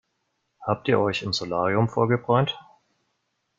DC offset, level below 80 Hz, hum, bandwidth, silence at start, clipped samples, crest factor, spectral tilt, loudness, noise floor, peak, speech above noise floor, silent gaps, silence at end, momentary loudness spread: under 0.1%; -62 dBFS; none; 7.6 kHz; 0.6 s; under 0.1%; 20 dB; -6 dB/octave; -24 LUFS; -75 dBFS; -6 dBFS; 52 dB; none; 1 s; 7 LU